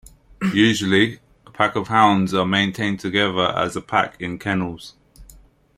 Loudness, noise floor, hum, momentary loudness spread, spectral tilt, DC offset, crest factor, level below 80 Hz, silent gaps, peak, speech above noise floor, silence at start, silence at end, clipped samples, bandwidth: -20 LUFS; -49 dBFS; none; 9 LU; -5 dB/octave; under 0.1%; 20 dB; -52 dBFS; none; -2 dBFS; 30 dB; 0.4 s; 0.55 s; under 0.1%; 14.5 kHz